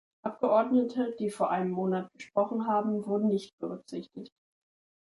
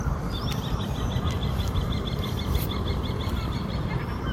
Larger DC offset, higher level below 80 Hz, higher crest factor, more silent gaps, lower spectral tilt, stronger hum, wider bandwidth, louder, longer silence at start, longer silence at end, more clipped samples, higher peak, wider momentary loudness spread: neither; second, -76 dBFS vs -32 dBFS; about the same, 16 dB vs 16 dB; first, 3.53-3.58 s vs none; first, -7.5 dB/octave vs -6 dB/octave; neither; second, 11.5 kHz vs 16.5 kHz; about the same, -30 LUFS vs -29 LUFS; first, 0.25 s vs 0 s; first, 0.8 s vs 0 s; neither; about the same, -14 dBFS vs -12 dBFS; first, 14 LU vs 2 LU